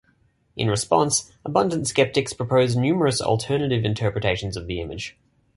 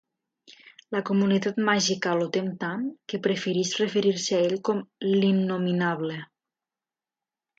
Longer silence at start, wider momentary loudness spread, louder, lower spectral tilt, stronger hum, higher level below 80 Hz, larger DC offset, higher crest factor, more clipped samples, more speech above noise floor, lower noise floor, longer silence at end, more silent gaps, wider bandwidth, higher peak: about the same, 0.55 s vs 0.5 s; about the same, 10 LU vs 8 LU; first, -22 LUFS vs -26 LUFS; about the same, -4.5 dB/octave vs -5 dB/octave; neither; first, -46 dBFS vs -72 dBFS; neither; about the same, 20 dB vs 18 dB; neither; second, 41 dB vs over 65 dB; second, -63 dBFS vs under -90 dBFS; second, 0.45 s vs 1.35 s; neither; first, 11.5 kHz vs 8 kHz; first, -4 dBFS vs -10 dBFS